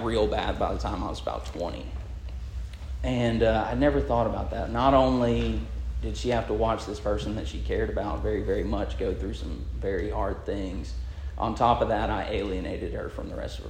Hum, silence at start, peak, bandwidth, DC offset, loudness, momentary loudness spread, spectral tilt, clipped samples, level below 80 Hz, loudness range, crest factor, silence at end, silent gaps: none; 0 s; -8 dBFS; 9.6 kHz; under 0.1%; -28 LUFS; 12 LU; -7 dB/octave; under 0.1%; -34 dBFS; 6 LU; 20 dB; 0 s; none